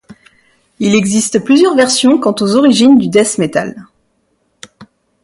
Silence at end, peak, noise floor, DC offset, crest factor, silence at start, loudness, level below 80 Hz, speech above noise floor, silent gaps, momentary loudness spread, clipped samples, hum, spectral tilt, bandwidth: 0.4 s; 0 dBFS; -61 dBFS; under 0.1%; 12 dB; 0.8 s; -10 LUFS; -54 dBFS; 51 dB; none; 8 LU; under 0.1%; none; -4 dB/octave; 11.5 kHz